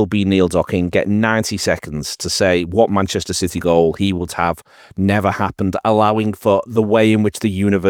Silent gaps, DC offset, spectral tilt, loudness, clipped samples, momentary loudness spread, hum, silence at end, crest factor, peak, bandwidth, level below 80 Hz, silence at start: none; under 0.1%; -5.5 dB/octave; -17 LUFS; under 0.1%; 6 LU; none; 0 s; 16 dB; 0 dBFS; 17.5 kHz; -46 dBFS; 0 s